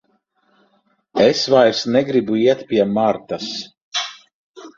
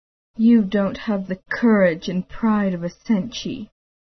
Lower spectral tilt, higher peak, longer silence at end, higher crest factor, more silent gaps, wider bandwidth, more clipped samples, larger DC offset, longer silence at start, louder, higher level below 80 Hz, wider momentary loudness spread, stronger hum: second, -4.5 dB/octave vs -7 dB/octave; first, -2 dBFS vs -6 dBFS; second, 0.1 s vs 0.5 s; about the same, 18 dB vs 14 dB; first, 3.82-3.91 s, 4.33-4.54 s vs none; first, 7.6 kHz vs 6.4 kHz; neither; second, under 0.1% vs 0.1%; first, 1.15 s vs 0.4 s; first, -17 LUFS vs -20 LUFS; second, -60 dBFS vs -50 dBFS; about the same, 13 LU vs 14 LU; neither